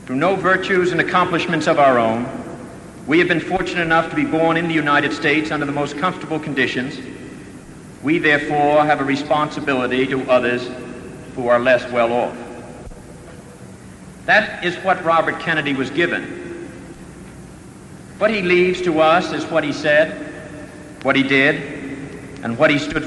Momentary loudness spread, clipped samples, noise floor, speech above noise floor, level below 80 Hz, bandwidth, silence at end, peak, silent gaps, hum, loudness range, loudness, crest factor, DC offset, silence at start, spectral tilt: 22 LU; under 0.1%; -38 dBFS; 21 dB; -48 dBFS; 11.5 kHz; 0 s; -2 dBFS; none; none; 4 LU; -17 LUFS; 16 dB; under 0.1%; 0 s; -5.5 dB/octave